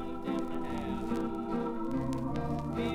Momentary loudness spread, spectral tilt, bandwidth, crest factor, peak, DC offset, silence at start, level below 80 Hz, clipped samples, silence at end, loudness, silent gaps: 2 LU; -7.5 dB/octave; 15 kHz; 14 dB; -20 dBFS; under 0.1%; 0 s; -48 dBFS; under 0.1%; 0 s; -35 LUFS; none